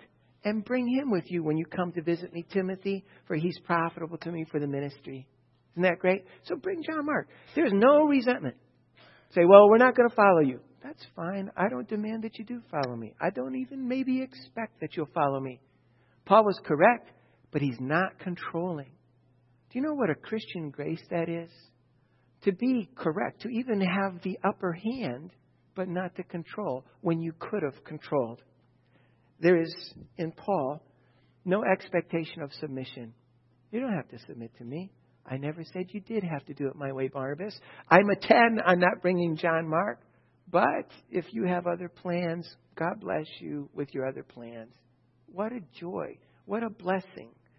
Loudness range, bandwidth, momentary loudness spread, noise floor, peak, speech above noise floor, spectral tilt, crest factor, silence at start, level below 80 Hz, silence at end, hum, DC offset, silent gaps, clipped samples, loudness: 14 LU; 6 kHz; 18 LU; -66 dBFS; -2 dBFS; 38 dB; -9.5 dB/octave; 28 dB; 0.45 s; -74 dBFS; 0.3 s; none; under 0.1%; none; under 0.1%; -28 LUFS